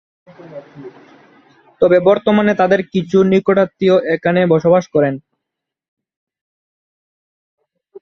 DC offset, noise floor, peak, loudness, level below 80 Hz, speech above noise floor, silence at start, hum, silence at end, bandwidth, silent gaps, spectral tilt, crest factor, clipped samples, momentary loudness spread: under 0.1%; -80 dBFS; -2 dBFS; -14 LUFS; -56 dBFS; 67 dB; 0.45 s; none; 0.05 s; 6.4 kHz; 5.88-5.97 s, 6.17-6.27 s, 6.41-7.58 s; -7.5 dB/octave; 16 dB; under 0.1%; 9 LU